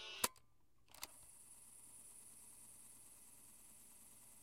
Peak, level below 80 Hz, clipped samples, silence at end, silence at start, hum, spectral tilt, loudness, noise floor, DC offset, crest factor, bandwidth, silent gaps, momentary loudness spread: -18 dBFS; -80 dBFS; under 0.1%; 0 s; 0 s; none; 0 dB/octave; -52 LUFS; -77 dBFS; under 0.1%; 36 dB; 16 kHz; none; 18 LU